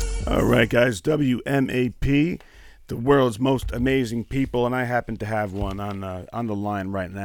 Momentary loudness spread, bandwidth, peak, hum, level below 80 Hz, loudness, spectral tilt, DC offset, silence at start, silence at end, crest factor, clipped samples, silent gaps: 11 LU; 18.5 kHz; -4 dBFS; none; -36 dBFS; -23 LUFS; -6.5 dB/octave; under 0.1%; 0 s; 0 s; 18 dB; under 0.1%; none